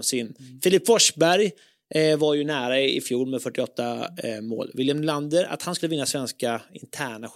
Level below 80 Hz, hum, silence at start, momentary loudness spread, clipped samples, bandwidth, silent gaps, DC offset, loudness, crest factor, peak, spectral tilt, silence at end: -72 dBFS; none; 0 s; 13 LU; under 0.1%; 16.5 kHz; none; under 0.1%; -24 LUFS; 18 dB; -6 dBFS; -3.5 dB/octave; 0.05 s